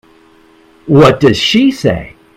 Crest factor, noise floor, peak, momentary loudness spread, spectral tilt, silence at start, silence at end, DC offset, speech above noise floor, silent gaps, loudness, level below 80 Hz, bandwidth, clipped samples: 12 dB; -45 dBFS; 0 dBFS; 12 LU; -6 dB/octave; 0.85 s; 0.3 s; under 0.1%; 36 dB; none; -10 LUFS; -38 dBFS; 15.5 kHz; 0.5%